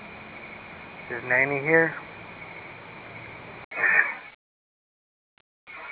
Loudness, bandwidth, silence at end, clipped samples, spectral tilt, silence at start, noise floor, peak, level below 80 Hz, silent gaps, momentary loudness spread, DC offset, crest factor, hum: -23 LUFS; 4 kHz; 0 s; under 0.1%; -4 dB/octave; 0 s; under -90 dBFS; -6 dBFS; -64 dBFS; 3.64-3.71 s, 4.35-5.67 s; 20 LU; under 0.1%; 24 dB; none